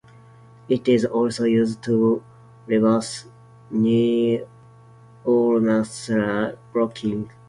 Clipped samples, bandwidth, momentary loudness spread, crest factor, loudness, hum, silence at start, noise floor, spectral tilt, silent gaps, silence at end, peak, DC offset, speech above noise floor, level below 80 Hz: under 0.1%; 11 kHz; 9 LU; 16 dB; -21 LUFS; none; 0.7 s; -48 dBFS; -6.5 dB/octave; none; 0.2 s; -6 dBFS; under 0.1%; 28 dB; -60 dBFS